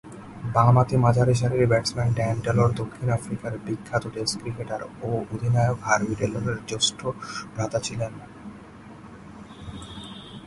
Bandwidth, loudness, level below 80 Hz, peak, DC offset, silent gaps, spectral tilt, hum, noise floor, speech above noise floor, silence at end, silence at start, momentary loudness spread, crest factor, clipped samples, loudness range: 11.5 kHz; -24 LUFS; -48 dBFS; -4 dBFS; under 0.1%; none; -5.5 dB/octave; none; -44 dBFS; 20 dB; 0 s; 0.05 s; 22 LU; 20 dB; under 0.1%; 8 LU